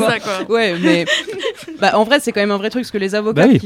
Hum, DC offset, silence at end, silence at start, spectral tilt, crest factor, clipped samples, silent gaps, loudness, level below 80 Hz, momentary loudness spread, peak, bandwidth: none; under 0.1%; 0 s; 0 s; -5 dB/octave; 16 dB; under 0.1%; none; -16 LUFS; -56 dBFS; 8 LU; 0 dBFS; 16 kHz